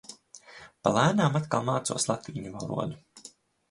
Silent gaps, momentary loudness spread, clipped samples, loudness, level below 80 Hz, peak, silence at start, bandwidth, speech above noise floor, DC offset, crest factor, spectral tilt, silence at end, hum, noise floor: none; 25 LU; under 0.1%; -28 LUFS; -62 dBFS; -6 dBFS; 0.1 s; 11.5 kHz; 26 dB; under 0.1%; 24 dB; -5 dB/octave; 0.4 s; none; -54 dBFS